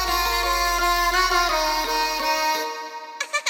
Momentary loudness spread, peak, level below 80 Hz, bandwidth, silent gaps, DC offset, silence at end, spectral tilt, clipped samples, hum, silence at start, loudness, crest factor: 11 LU; -8 dBFS; -38 dBFS; over 20 kHz; none; under 0.1%; 0 s; -1 dB/octave; under 0.1%; none; 0 s; -21 LUFS; 16 dB